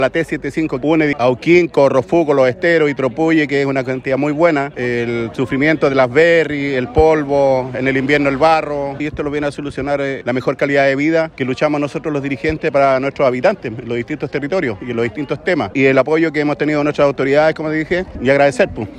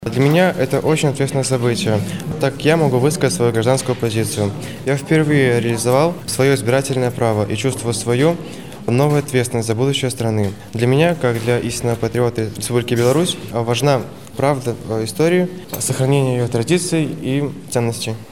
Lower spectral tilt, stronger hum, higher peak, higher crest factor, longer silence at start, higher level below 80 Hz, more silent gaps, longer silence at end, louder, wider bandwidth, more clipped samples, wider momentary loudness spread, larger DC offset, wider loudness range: about the same, -6.5 dB/octave vs -5.5 dB/octave; neither; about the same, 0 dBFS vs 0 dBFS; about the same, 14 dB vs 16 dB; about the same, 0 s vs 0 s; first, -42 dBFS vs -48 dBFS; neither; about the same, 0 s vs 0.05 s; about the same, -15 LUFS vs -17 LUFS; second, 10.5 kHz vs 16.5 kHz; neither; about the same, 8 LU vs 7 LU; second, under 0.1% vs 0.7%; about the same, 3 LU vs 2 LU